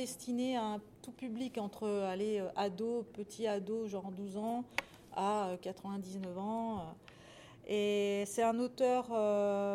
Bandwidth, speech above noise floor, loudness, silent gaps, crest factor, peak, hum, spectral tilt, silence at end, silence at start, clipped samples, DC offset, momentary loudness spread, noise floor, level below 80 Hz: 16 kHz; 20 dB; -37 LUFS; none; 22 dB; -16 dBFS; none; -5 dB/octave; 0 s; 0 s; under 0.1%; under 0.1%; 12 LU; -57 dBFS; -72 dBFS